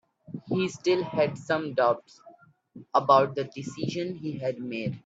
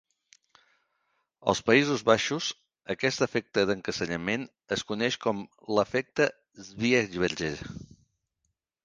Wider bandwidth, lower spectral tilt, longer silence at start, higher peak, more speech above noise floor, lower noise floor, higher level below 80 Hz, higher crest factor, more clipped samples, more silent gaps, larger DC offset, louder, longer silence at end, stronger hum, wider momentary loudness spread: second, 8 kHz vs 10 kHz; first, -6 dB/octave vs -4 dB/octave; second, 0.3 s vs 1.45 s; about the same, -6 dBFS vs -6 dBFS; second, 28 dB vs 53 dB; second, -55 dBFS vs -80 dBFS; second, -68 dBFS vs -60 dBFS; about the same, 22 dB vs 24 dB; neither; neither; neither; about the same, -27 LUFS vs -28 LUFS; second, 0.1 s vs 1 s; neither; about the same, 12 LU vs 14 LU